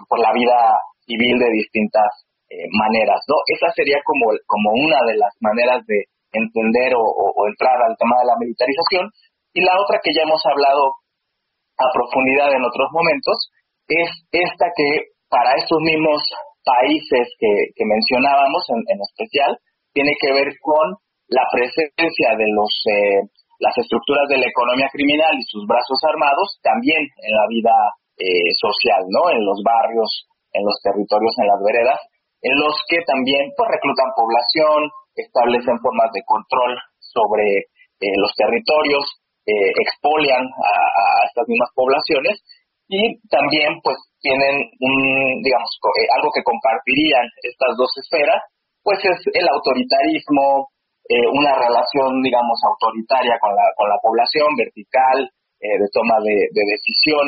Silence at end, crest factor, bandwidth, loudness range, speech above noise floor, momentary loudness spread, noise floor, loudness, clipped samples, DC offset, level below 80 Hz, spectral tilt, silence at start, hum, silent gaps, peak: 0 s; 14 dB; 5.2 kHz; 2 LU; 59 dB; 7 LU; -75 dBFS; -17 LUFS; under 0.1%; under 0.1%; -60 dBFS; -1 dB/octave; 0 s; none; none; -4 dBFS